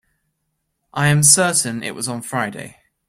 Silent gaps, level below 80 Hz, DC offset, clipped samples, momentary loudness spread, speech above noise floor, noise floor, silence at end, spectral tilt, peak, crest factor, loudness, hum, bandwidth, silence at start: none; -56 dBFS; under 0.1%; under 0.1%; 16 LU; 55 dB; -73 dBFS; 0.4 s; -3 dB/octave; 0 dBFS; 20 dB; -16 LUFS; none; 16.5 kHz; 0.95 s